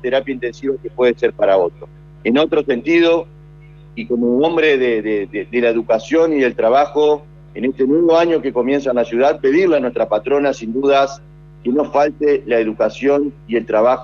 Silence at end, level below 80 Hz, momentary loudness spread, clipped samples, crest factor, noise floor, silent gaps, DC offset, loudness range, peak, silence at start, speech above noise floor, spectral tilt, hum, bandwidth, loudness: 0 s; -48 dBFS; 9 LU; under 0.1%; 14 dB; -40 dBFS; none; under 0.1%; 2 LU; -2 dBFS; 0.05 s; 25 dB; -6 dB/octave; 50 Hz at -40 dBFS; 7.2 kHz; -16 LUFS